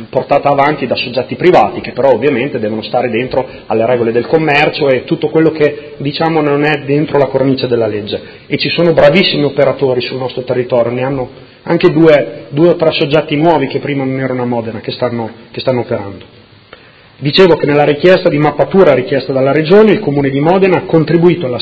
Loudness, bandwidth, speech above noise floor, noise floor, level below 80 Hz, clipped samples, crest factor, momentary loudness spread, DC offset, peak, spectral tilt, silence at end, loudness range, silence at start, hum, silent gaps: -11 LUFS; 8 kHz; 28 dB; -39 dBFS; -46 dBFS; 0.7%; 12 dB; 10 LU; under 0.1%; 0 dBFS; -8 dB/octave; 0 s; 5 LU; 0 s; none; none